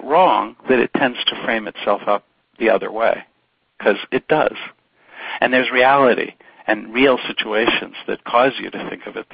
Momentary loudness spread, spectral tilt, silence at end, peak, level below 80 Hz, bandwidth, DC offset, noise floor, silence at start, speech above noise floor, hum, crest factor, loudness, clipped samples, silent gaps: 14 LU; -9.5 dB/octave; 0.1 s; 0 dBFS; -56 dBFS; 5.2 kHz; under 0.1%; -61 dBFS; 0 s; 43 dB; none; 18 dB; -18 LUFS; under 0.1%; none